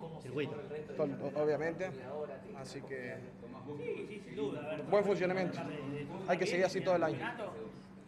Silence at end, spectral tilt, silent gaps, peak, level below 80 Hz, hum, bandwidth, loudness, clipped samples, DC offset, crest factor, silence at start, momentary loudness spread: 0 s; -6 dB/octave; none; -18 dBFS; -70 dBFS; none; 13 kHz; -37 LUFS; under 0.1%; under 0.1%; 20 dB; 0 s; 14 LU